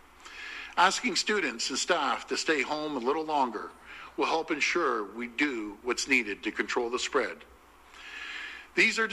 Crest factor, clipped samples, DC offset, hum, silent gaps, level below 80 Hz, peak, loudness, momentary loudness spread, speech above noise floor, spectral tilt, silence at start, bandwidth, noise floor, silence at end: 22 dB; under 0.1%; under 0.1%; none; none; -64 dBFS; -8 dBFS; -29 LUFS; 16 LU; 24 dB; -1.5 dB/octave; 0.2 s; 14.5 kHz; -53 dBFS; 0 s